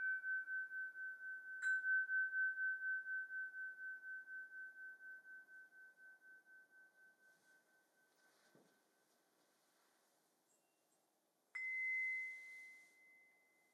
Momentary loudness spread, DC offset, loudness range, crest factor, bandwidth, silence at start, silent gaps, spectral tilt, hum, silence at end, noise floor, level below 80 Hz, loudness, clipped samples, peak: 24 LU; under 0.1%; 20 LU; 16 dB; 13.5 kHz; 0 s; none; 0.5 dB/octave; none; 0.5 s; -83 dBFS; under -90 dBFS; -43 LUFS; under 0.1%; -32 dBFS